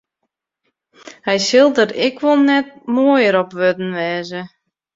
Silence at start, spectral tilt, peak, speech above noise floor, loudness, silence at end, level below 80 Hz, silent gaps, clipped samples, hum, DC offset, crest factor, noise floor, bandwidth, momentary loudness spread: 1.05 s; -4.5 dB/octave; -2 dBFS; 60 dB; -15 LUFS; 0.5 s; -64 dBFS; none; under 0.1%; none; under 0.1%; 16 dB; -75 dBFS; 7.8 kHz; 13 LU